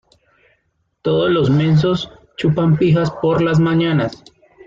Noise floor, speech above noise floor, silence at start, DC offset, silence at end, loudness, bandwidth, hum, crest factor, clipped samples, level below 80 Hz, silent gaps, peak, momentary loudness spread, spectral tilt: -66 dBFS; 51 dB; 1.05 s; under 0.1%; 0.5 s; -16 LUFS; 7.4 kHz; none; 12 dB; under 0.1%; -46 dBFS; none; -4 dBFS; 8 LU; -8 dB/octave